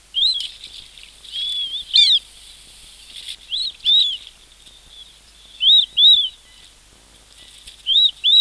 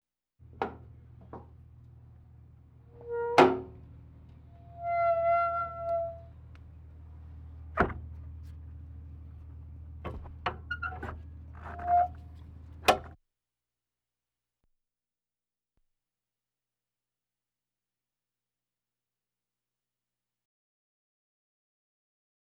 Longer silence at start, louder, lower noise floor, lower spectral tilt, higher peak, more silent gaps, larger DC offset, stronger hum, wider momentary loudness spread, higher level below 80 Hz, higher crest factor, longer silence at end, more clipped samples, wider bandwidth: second, 0.15 s vs 0.4 s; first, -14 LUFS vs -30 LUFS; second, -49 dBFS vs under -90 dBFS; second, 2.5 dB/octave vs -5.5 dB/octave; first, -4 dBFS vs -8 dBFS; neither; neither; second, none vs 60 Hz at -70 dBFS; second, 22 LU vs 25 LU; about the same, -54 dBFS vs -52 dBFS; second, 16 dB vs 28 dB; second, 0 s vs 9.3 s; neither; second, 13 kHz vs 17 kHz